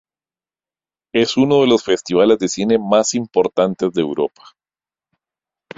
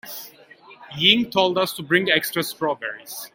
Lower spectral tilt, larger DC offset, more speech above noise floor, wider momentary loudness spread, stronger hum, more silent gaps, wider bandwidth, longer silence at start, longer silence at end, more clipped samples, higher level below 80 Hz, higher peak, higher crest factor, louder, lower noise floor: about the same, -4.5 dB/octave vs -3.5 dB/octave; neither; first, over 74 dB vs 26 dB; second, 7 LU vs 18 LU; neither; neither; second, 7.8 kHz vs 17 kHz; first, 1.15 s vs 0.05 s; first, 1.5 s vs 0.05 s; neither; first, -58 dBFS vs -64 dBFS; about the same, -2 dBFS vs 0 dBFS; second, 16 dB vs 22 dB; first, -16 LUFS vs -20 LUFS; first, under -90 dBFS vs -48 dBFS